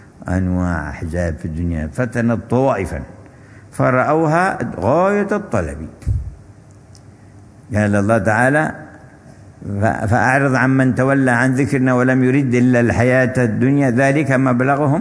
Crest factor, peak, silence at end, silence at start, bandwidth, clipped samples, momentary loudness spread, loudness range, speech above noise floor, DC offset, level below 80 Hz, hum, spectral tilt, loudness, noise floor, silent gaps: 16 dB; 0 dBFS; 0 s; 0.2 s; 11 kHz; under 0.1%; 10 LU; 6 LU; 27 dB; under 0.1%; -36 dBFS; none; -7.5 dB/octave; -16 LUFS; -42 dBFS; none